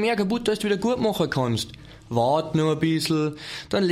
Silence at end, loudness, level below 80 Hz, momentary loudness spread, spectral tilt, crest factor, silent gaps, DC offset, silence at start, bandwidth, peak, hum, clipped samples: 0 s; -24 LUFS; -52 dBFS; 7 LU; -5.5 dB/octave; 14 dB; none; under 0.1%; 0 s; 16 kHz; -8 dBFS; none; under 0.1%